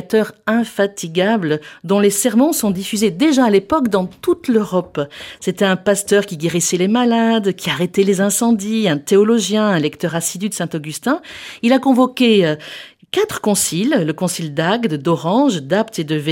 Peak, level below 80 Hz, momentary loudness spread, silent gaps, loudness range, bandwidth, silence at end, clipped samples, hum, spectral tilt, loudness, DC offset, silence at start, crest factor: -2 dBFS; -56 dBFS; 8 LU; none; 2 LU; 17 kHz; 0 s; under 0.1%; none; -4.5 dB/octave; -16 LUFS; under 0.1%; 0 s; 14 dB